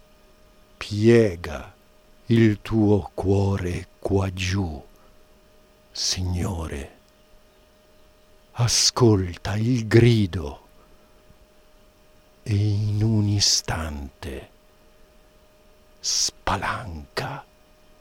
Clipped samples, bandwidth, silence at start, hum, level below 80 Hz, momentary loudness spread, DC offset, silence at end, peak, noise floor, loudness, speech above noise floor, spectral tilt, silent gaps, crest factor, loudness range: under 0.1%; 16 kHz; 0.8 s; none; -44 dBFS; 19 LU; under 0.1%; 0.6 s; -2 dBFS; -55 dBFS; -22 LUFS; 34 dB; -5 dB/octave; none; 22 dB; 8 LU